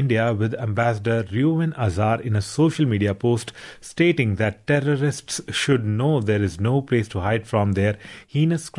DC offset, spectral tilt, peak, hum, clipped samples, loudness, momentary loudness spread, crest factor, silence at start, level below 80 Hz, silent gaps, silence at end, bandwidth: under 0.1%; -6.5 dB/octave; -6 dBFS; none; under 0.1%; -22 LUFS; 5 LU; 16 dB; 0 s; -54 dBFS; none; 0 s; 11.5 kHz